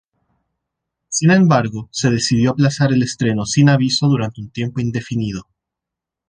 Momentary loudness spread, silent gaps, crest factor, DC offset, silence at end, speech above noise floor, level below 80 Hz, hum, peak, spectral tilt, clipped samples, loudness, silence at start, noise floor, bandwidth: 11 LU; none; 16 dB; under 0.1%; 0.85 s; 68 dB; -48 dBFS; none; -2 dBFS; -5.5 dB/octave; under 0.1%; -17 LUFS; 1.1 s; -84 dBFS; 10 kHz